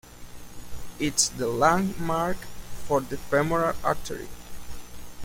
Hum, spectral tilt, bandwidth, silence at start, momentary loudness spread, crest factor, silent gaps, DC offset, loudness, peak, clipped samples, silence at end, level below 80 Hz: 60 Hz at -45 dBFS; -3.5 dB/octave; 16.5 kHz; 0.05 s; 22 LU; 22 dB; none; under 0.1%; -26 LUFS; -6 dBFS; under 0.1%; 0 s; -44 dBFS